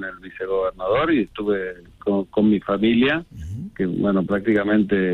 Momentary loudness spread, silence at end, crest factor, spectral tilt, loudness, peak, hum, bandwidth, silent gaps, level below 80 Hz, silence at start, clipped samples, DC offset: 14 LU; 0 s; 14 dB; -8.5 dB/octave; -21 LUFS; -8 dBFS; none; 4.3 kHz; none; -48 dBFS; 0 s; under 0.1%; under 0.1%